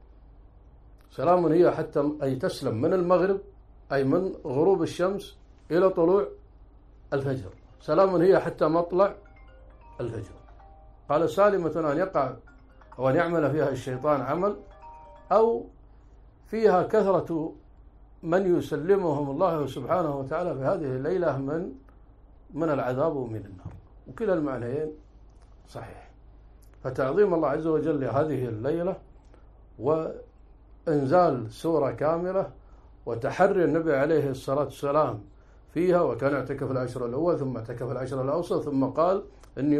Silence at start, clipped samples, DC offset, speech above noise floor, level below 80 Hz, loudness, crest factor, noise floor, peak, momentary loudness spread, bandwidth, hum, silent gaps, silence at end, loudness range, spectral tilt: 1.15 s; under 0.1%; under 0.1%; 27 dB; -52 dBFS; -26 LUFS; 18 dB; -52 dBFS; -8 dBFS; 14 LU; 13 kHz; none; none; 0 s; 5 LU; -8 dB/octave